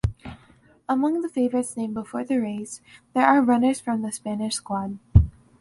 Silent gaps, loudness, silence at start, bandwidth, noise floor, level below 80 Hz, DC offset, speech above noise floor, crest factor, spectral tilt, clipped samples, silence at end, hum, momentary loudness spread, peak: none; -24 LUFS; 0.05 s; 11.5 kHz; -56 dBFS; -34 dBFS; under 0.1%; 32 dB; 22 dB; -6.5 dB/octave; under 0.1%; 0.3 s; none; 15 LU; -2 dBFS